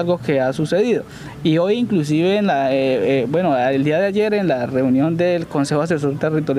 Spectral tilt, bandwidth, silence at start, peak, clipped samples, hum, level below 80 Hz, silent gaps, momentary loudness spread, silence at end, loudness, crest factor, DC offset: -7 dB/octave; 14 kHz; 0 s; -6 dBFS; under 0.1%; none; -54 dBFS; none; 3 LU; 0 s; -18 LUFS; 12 dB; under 0.1%